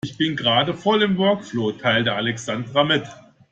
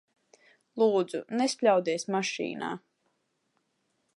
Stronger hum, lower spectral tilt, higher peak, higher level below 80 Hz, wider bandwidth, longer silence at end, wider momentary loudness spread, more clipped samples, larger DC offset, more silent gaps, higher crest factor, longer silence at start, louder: neither; about the same, -5 dB/octave vs -4 dB/octave; first, -4 dBFS vs -10 dBFS; first, -58 dBFS vs -82 dBFS; second, 9.2 kHz vs 11.5 kHz; second, 0.3 s vs 1.4 s; second, 6 LU vs 12 LU; neither; neither; neither; about the same, 16 dB vs 20 dB; second, 0.05 s vs 0.75 s; first, -20 LUFS vs -28 LUFS